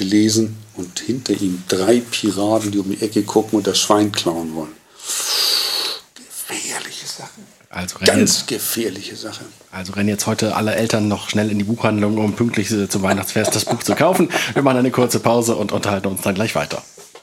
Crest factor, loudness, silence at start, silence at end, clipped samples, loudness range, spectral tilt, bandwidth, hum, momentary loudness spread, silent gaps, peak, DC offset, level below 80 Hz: 18 dB; -18 LUFS; 0 s; 0.05 s; under 0.1%; 3 LU; -4 dB/octave; 16.5 kHz; none; 14 LU; none; 0 dBFS; under 0.1%; -60 dBFS